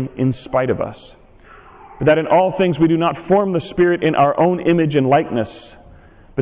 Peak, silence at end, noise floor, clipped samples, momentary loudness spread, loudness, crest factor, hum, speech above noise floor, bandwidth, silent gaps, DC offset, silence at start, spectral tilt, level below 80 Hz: -6 dBFS; 0 s; -44 dBFS; under 0.1%; 8 LU; -17 LUFS; 12 dB; none; 28 dB; 4 kHz; none; under 0.1%; 0 s; -11 dB/octave; -46 dBFS